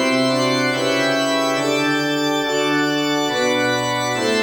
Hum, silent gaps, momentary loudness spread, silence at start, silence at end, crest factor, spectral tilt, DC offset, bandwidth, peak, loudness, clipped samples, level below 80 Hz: none; none; 2 LU; 0 s; 0 s; 12 dB; -3.5 dB/octave; under 0.1%; over 20 kHz; -6 dBFS; -18 LUFS; under 0.1%; -60 dBFS